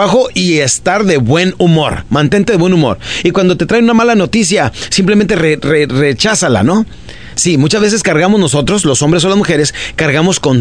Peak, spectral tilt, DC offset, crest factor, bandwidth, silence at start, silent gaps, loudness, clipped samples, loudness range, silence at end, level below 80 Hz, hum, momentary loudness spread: 0 dBFS; -4.5 dB/octave; 1%; 10 dB; 10.5 kHz; 0 s; none; -10 LUFS; under 0.1%; 1 LU; 0 s; -36 dBFS; none; 4 LU